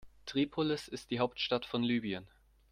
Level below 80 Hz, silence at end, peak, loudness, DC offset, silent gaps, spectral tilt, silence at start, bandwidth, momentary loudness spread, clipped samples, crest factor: -64 dBFS; 0.45 s; -16 dBFS; -35 LUFS; under 0.1%; none; -5.5 dB/octave; 0 s; 14.5 kHz; 7 LU; under 0.1%; 20 dB